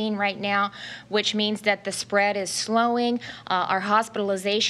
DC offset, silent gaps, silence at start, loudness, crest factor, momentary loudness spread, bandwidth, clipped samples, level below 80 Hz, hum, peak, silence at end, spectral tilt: under 0.1%; none; 0 s; -24 LUFS; 18 dB; 5 LU; 13 kHz; under 0.1%; -70 dBFS; none; -6 dBFS; 0 s; -3 dB/octave